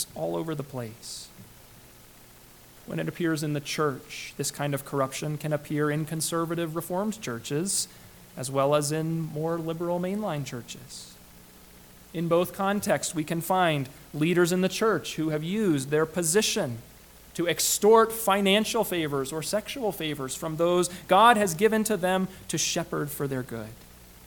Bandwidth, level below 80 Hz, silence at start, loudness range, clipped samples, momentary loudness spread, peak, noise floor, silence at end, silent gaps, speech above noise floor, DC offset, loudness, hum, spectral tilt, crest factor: 19 kHz; -58 dBFS; 0 s; 8 LU; under 0.1%; 15 LU; -4 dBFS; -52 dBFS; 0 s; none; 25 dB; under 0.1%; -26 LUFS; none; -4 dB/octave; 24 dB